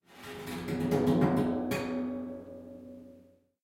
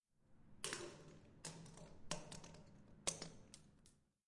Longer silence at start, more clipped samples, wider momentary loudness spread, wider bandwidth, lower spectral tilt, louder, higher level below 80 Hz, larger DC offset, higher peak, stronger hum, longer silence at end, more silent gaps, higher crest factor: about the same, 0.1 s vs 0.2 s; neither; first, 21 LU vs 18 LU; first, 16.5 kHz vs 11.5 kHz; first, -7 dB/octave vs -2 dB/octave; first, -31 LUFS vs -50 LUFS; first, -60 dBFS vs -70 dBFS; neither; first, -12 dBFS vs -22 dBFS; neither; first, 0.45 s vs 0.3 s; neither; second, 20 dB vs 32 dB